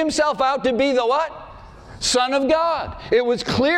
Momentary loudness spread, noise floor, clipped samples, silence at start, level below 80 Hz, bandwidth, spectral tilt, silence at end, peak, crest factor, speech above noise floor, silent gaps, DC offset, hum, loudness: 6 LU; -40 dBFS; under 0.1%; 0 s; -46 dBFS; 13 kHz; -3.5 dB/octave; 0 s; -8 dBFS; 12 dB; 21 dB; none; under 0.1%; none; -20 LUFS